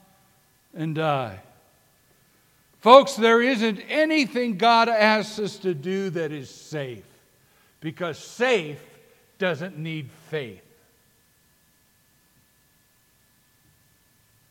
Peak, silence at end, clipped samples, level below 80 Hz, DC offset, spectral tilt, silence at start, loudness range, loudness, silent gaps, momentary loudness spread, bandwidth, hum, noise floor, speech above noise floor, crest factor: 0 dBFS; 3.95 s; under 0.1%; -74 dBFS; under 0.1%; -5 dB/octave; 0.75 s; 15 LU; -22 LUFS; none; 19 LU; 16.5 kHz; none; -62 dBFS; 40 dB; 24 dB